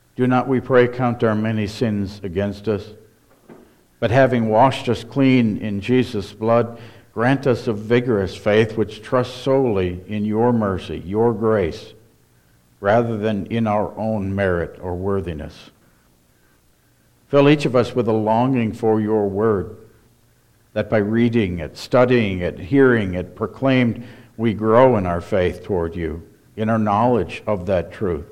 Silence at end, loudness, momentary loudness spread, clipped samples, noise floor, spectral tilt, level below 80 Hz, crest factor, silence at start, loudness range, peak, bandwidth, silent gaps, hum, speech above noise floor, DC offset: 0.05 s; -19 LUFS; 10 LU; under 0.1%; -57 dBFS; -7.5 dB/octave; -46 dBFS; 18 dB; 0.2 s; 4 LU; -2 dBFS; 12.5 kHz; none; none; 39 dB; under 0.1%